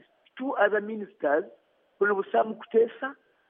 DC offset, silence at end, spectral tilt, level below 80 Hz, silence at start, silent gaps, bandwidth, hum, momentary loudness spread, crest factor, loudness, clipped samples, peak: under 0.1%; 0.35 s; -3 dB/octave; under -90 dBFS; 0.35 s; none; 3.7 kHz; none; 12 LU; 20 dB; -27 LUFS; under 0.1%; -8 dBFS